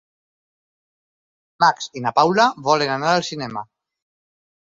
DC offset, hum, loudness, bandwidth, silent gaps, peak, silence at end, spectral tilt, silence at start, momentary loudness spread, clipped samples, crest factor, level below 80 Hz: under 0.1%; none; -19 LUFS; 7.8 kHz; none; -2 dBFS; 1.05 s; -4 dB/octave; 1.6 s; 12 LU; under 0.1%; 20 dB; -66 dBFS